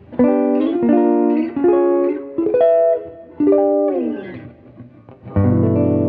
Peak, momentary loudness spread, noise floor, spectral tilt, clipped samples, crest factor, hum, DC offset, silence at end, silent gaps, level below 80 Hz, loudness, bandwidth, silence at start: -4 dBFS; 10 LU; -41 dBFS; -13 dB/octave; under 0.1%; 12 dB; none; under 0.1%; 0 s; none; -48 dBFS; -16 LUFS; 4 kHz; 0.1 s